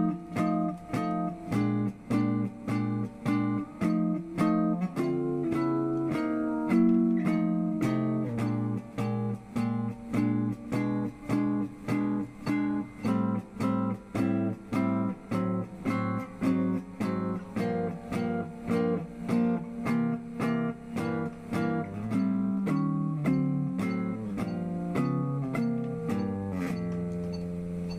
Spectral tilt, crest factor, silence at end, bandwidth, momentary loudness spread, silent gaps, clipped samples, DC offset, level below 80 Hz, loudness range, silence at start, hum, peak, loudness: -8.5 dB/octave; 16 dB; 0 s; 15 kHz; 5 LU; none; under 0.1%; under 0.1%; -58 dBFS; 3 LU; 0 s; none; -14 dBFS; -30 LUFS